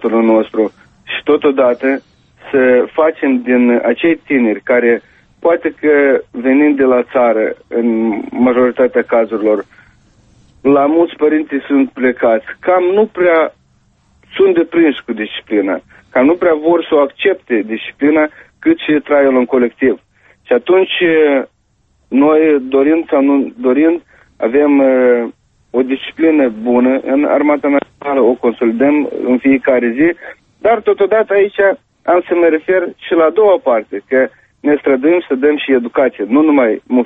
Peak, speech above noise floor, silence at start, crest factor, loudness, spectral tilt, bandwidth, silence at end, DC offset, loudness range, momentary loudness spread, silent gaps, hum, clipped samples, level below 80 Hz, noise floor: 0 dBFS; 46 dB; 0 s; 12 dB; -13 LUFS; -8 dB/octave; 3.9 kHz; 0 s; under 0.1%; 2 LU; 7 LU; none; none; under 0.1%; -54 dBFS; -57 dBFS